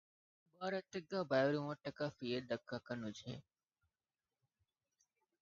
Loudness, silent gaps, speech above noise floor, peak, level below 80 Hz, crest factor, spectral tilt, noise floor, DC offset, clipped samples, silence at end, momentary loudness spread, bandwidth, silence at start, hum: -42 LUFS; none; over 49 dB; -22 dBFS; -80 dBFS; 22 dB; -4.5 dB/octave; under -90 dBFS; under 0.1%; under 0.1%; 2 s; 12 LU; 7.4 kHz; 0.6 s; none